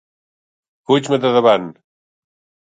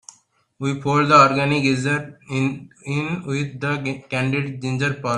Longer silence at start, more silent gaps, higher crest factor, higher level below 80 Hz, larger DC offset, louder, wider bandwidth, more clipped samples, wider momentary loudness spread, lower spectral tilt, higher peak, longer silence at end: first, 0.9 s vs 0.6 s; neither; about the same, 18 dB vs 20 dB; second, -68 dBFS vs -58 dBFS; neither; first, -15 LUFS vs -20 LUFS; second, 9.2 kHz vs 11 kHz; neither; second, 6 LU vs 13 LU; about the same, -5.5 dB/octave vs -6 dB/octave; about the same, 0 dBFS vs 0 dBFS; first, 1 s vs 0 s